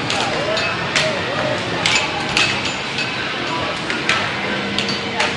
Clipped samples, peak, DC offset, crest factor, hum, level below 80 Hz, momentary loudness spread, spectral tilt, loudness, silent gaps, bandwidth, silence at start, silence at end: under 0.1%; 0 dBFS; under 0.1%; 20 dB; none; -48 dBFS; 5 LU; -3 dB/octave; -18 LUFS; none; 11.5 kHz; 0 s; 0 s